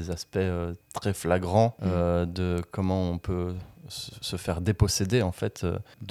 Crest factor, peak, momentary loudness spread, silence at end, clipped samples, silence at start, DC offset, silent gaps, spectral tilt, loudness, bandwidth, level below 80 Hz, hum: 20 dB; -8 dBFS; 11 LU; 0 s; under 0.1%; 0 s; under 0.1%; none; -5.5 dB/octave; -28 LUFS; 14.5 kHz; -46 dBFS; none